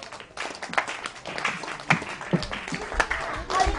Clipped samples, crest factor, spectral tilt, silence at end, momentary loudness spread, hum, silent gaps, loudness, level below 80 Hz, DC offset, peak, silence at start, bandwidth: under 0.1%; 24 dB; -4 dB/octave; 0 s; 9 LU; none; none; -28 LUFS; -40 dBFS; under 0.1%; -4 dBFS; 0 s; 10.5 kHz